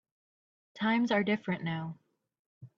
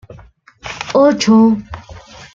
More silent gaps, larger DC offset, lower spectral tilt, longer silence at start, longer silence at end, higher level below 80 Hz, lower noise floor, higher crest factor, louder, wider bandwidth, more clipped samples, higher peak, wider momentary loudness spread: first, 2.39-2.61 s vs none; neither; first, -7 dB/octave vs -5.5 dB/octave; first, 0.75 s vs 0.1 s; about the same, 0.1 s vs 0.1 s; second, -76 dBFS vs -44 dBFS; first, under -90 dBFS vs -42 dBFS; about the same, 18 dB vs 14 dB; second, -31 LUFS vs -12 LUFS; about the same, 7 kHz vs 7.6 kHz; neither; second, -16 dBFS vs -2 dBFS; second, 10 LU vs 22 LU